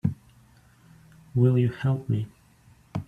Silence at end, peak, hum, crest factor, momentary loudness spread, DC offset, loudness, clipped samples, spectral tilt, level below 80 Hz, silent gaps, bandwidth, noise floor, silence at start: 0.05 s; -10 dBFS; none; 18 dB; 17 LU; under 0.1%; -26 LUFS; under 0.1%; -9.5 dB/octave; -58 dBFS; none; 4.9 kHz; -57 dBFS; 0.05 s